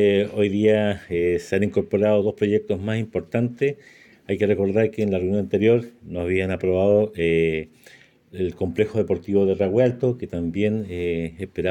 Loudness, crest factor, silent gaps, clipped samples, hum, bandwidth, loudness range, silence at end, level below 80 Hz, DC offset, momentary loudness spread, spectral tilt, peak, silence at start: -22 LUFS; 16 dB; none; under 0.1%; none; 11.5 kHz; 2 LU; 0 s; -52 dBFS; under 0.1%; 8 LU; -8 dB/octave; -6 dBFS; 0 s